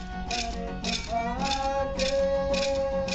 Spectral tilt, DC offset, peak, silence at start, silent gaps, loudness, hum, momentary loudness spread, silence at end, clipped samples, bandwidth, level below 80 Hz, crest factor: -4 dB/octave; under 0.1%; -14 dBFS; 0 s; none; -28 LUFS; none; 5 LU; 0 s; under 0.1%; 8.8 kHz; -40 dBFS; 14 dB